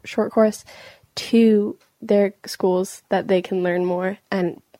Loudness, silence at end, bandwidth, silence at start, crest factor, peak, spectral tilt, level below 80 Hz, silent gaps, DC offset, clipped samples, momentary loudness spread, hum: -21 LUFS; 0.25 s; 16 kHz; 0.05 s; 16 dB; -4 dBFS; -6 dB/octave; -66 dBFS; none; under 0.1%; under 0.1%; 11 LU; none